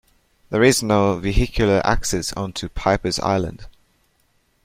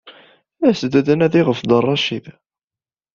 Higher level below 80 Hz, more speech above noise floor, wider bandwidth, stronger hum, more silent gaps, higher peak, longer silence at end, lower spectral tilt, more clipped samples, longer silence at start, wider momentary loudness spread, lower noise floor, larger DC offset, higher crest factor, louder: first, -32 dBFS vs -56 dBFS; second, 44 dB vs over 74 dB; first, 16.5 kHz vs 7.4 kHz; neither; neither; about the same, -2 dBFS vs -2 dBFS; about the same, 0.95 s vs 0.85 s; second, -4.5 dB/octave vs -6.5 dB/octave; neither; first, 0.5 s vs 0.05 s; first, 10 LU vs 5 LU; second, -63 dBFS vs under -90 dBFS; neither; about the same, 20 dB vs 16 dB; second, -20 LUFS vs -16 LUFS